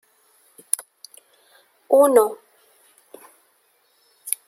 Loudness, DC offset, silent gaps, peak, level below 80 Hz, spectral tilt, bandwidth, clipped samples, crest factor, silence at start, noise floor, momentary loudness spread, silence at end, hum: -19 LUFS; under 0.1%; none; 0 dBFS; -78 dBFS; -2 dB/octave; 16.5 kHz; under 0.1%; 24 dB; 0.8 s; -63 dBFS; 26 LU; 0.15 s; none